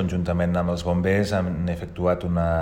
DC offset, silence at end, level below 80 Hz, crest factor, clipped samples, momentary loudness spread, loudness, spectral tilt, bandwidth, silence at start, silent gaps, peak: under 0.1%; 0 s; -42 dBFS; 14 dB; under 0.1%; 4 LU; -24 LUFS; -7.5 dB/octave; 10.5 kHz; 0 s; none; -8 dBFS